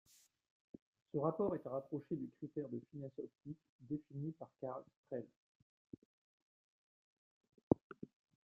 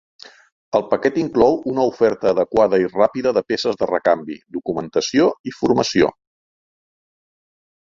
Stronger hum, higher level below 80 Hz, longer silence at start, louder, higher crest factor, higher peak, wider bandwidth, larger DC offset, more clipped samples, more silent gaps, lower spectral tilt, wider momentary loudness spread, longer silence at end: neither; second, -76 dBFS vs -54 dBFS; first, 1.15 s vs 0.75 s; second, -44 LUFS vs -18 LUFS; first, 32 dB vs 18 dB; second, -16 dBFS vs -2 dBFS; first, 9.8 kHz vs 7.6 kHz; neither; neither; first, 3.69-3.79 s, 4.96-5.04 s, 5.36-5.85 s, 5.98-7.41 s, 7.63-7.71 s, 7.81-7.90 s vs 5.40-5.44 s; first, -10 dB/octave vs -5 dB/octave; first, 22 LU vs 6 LU; second, 0.4 s vs 1.8 s